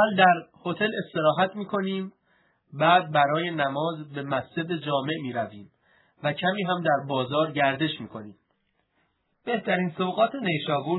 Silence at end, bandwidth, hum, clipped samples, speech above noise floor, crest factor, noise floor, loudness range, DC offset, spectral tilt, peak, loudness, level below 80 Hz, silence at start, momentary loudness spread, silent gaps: 0 s; 4.1 kHz; none; under 0.1%; 47 dB; 22 dB; -72 dBFS; 4 LU; under 0.1%; -9 dB/octave; -4 dBFS; -26 LUFS; -74 dBFS; 0 s; 13 LU; none